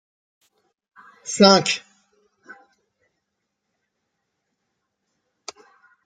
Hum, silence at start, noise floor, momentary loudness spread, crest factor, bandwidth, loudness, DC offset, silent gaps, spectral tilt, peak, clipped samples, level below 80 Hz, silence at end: none; 1.25 s; -79 dBFS; 27 LU; 26 dB; 9.4 kHz; -17 LUFS; under 0.1%; none; -3.5 dB/octave; 0 dBFS; under 0.1%; -68 dBFS; 4.3 s